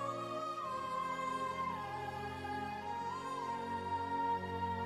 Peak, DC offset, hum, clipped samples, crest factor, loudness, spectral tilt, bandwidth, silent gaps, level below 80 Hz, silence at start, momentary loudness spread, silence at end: -26 dBFS; under 0.1%; none; under 0.1%; 12 dB; -40 LUFS; -5 dB/octave; 13 kHz; none; -68 dBFS; 0 s; 5 LU; 0 s